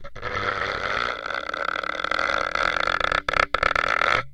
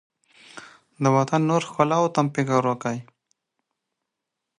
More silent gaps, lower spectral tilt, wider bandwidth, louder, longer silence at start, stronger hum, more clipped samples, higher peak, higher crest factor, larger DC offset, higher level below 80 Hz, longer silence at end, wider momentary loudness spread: neither; second, -3 dB/octave vs -6.5 dB/octave; about the same, 12 kHz vs 11 kHz; about the same, -23 LUFS vs -22 LUFS; second, 0 s vs 0.55 s; neither; neither; first, 0 dBFS vs -4 dBFS; about the same, 24 dB vs 22 dB; neither; first, -42 dBFS vs -72 dBFS; second, 0 s vs 1.55 s; second, 6 LU vs 19 LU